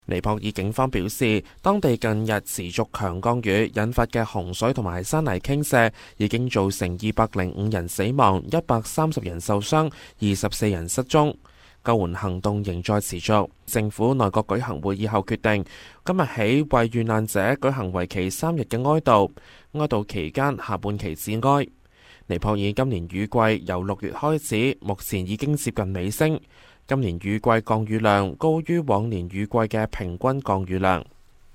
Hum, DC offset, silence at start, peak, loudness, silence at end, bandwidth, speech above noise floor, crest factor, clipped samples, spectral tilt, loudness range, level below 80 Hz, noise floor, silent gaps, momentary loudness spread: none; under 0.1%; 0.1 s; -2 dBFS; -24 LUFS; 0.5 s; 16 kHz; 29 dB; 22 dB; under 0.1%; -6 dB/octave; 2 LU; -44 dBFS; -52 dBFS; none; 7 LU